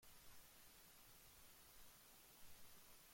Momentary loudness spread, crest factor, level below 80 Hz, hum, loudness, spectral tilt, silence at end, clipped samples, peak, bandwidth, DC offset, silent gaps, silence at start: 0 LU; 14 dB; -76 dBFS; none; -65 LUFS; -1.5 dB/octave; 0 s; under 0.1%; -50 dBFS; 16.5 kHz; under 0.1%; none; 0 s